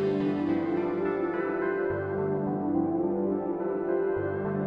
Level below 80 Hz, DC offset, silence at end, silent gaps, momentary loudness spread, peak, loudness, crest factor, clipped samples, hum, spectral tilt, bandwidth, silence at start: -62 dBFS; under 0.1%; 0 s; none; 2 LU; -16 dBFS; -29 LUFS; 12 dB; under 0.1%; none; -10 dB/octave; 5.2 kHz; 0 s